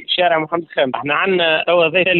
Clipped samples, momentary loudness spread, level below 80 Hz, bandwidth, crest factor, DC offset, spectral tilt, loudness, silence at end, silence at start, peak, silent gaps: under 0.1%; 5 LU; -60 dBFS; 4.4 kHz; 12 dB; under 0.1%; -9 dB/octave; -16 LUFS; 0 s; 0 s; -2 dBFS; none